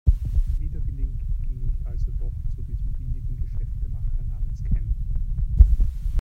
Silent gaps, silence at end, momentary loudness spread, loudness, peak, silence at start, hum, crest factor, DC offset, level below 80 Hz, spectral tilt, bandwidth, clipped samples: none; 0 s; 12 LU; -28 LUFS; 0 dBFS; 0.05 s; none; 22 dB; under 0.1%; -24 dBFS; -9.5 dB/octave; 0.9 kHz; under 0.1%